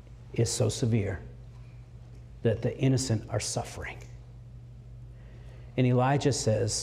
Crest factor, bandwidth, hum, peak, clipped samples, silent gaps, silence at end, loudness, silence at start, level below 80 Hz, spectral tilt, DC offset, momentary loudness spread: 16 dB; 14 kHz; none; -14 dBFS; under 0.1%; none; 0 s; -29 LUFS; 0.05 s; -50 dBFS; -5.5 dB/octave; under 0.1%; 22 LU